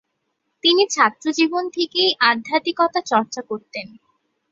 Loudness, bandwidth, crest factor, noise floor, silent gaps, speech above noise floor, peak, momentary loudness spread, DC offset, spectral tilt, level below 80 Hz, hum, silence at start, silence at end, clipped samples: -19 LUFS; 7.8 kHz; 20 dB; -74 dBFS; none; 54 dB; -2 dBFS; 14 LU; under 0.1%; -2 dB/octave; -72 dBFS; none; 0.65 s; 0.65 s; under 0.1%